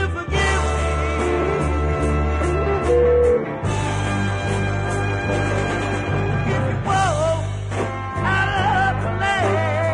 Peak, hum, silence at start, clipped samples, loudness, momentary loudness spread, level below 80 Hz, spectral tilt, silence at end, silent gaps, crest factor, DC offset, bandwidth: -6 dBFS; none; 0 s; under 0.1%; -20 LUFS; 5 LU; -30 dBFS; -6 dB/octave; 0 s; none; 14 dB; under 0.1%; 10.5 kHz